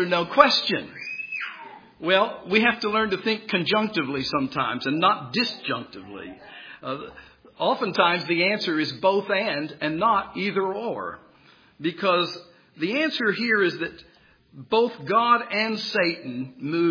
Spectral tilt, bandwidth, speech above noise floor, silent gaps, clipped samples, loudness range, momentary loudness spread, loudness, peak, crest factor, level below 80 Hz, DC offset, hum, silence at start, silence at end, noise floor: -5.5 dB/octave; 5.4 kHz; 31 dB; none; under 0.1%; 4 LU; 14 LU; -23 LUFS; 0 dBFS; 24 dB; -64 dBFS; under 0.1%; none; 0 s; 0 s; -55 dBFS